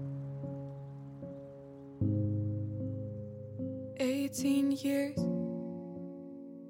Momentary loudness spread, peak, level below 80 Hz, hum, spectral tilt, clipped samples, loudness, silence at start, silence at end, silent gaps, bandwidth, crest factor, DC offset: 16 LU; -20 dBFS; -66 dBFS; none; -6.5 dB/octave; under 0.1%; -36 LUFS; 0 s; 0 s; none; 16.5 kHz; 16 dB; under 0.1%